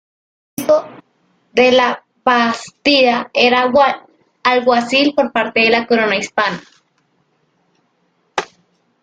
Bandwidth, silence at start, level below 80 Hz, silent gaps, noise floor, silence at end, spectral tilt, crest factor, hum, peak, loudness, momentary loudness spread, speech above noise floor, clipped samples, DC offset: 15.5 kHz; 0.6 s; -58 dBFS; none; -62 dBFS; 0.55 s; -3.5 dB/octave; 16 dB; none; 0 dBFS; -14 LUFS; 13 LU; 48 dB; under 0.1%; under 0.1%